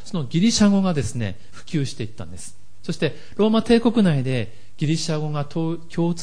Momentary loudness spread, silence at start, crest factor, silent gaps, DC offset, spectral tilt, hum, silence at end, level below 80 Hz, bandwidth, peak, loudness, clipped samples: 18 LU; 0.05 s; 18 dB; none; 3%; -6 dB/octave; none; 0 s; -48 dBFS; 10.5 kHz; -6 dBFS; -22 LUFS; under 0.1%